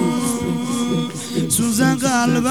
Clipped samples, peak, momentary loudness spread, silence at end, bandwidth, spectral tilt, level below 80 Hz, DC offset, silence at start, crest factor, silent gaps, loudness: under 0.1%; -4 dBFS; 6 LU; 0 s; 19 kHz; -4.5 dB/octave; -50 dBFS; 0.5%; 0 s; 14 dB; none; -19 LUFS